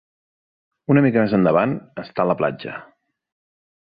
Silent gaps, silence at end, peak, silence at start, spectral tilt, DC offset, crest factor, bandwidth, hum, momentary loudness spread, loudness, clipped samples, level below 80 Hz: none; 1.1 s; -4 dBFS; 0.9 s; -11.5 dB/octave; under 0.1%; 18 dB; 5 kHz; none; 17 LU; -19 LUFS; under 0.1%; -58 dBFS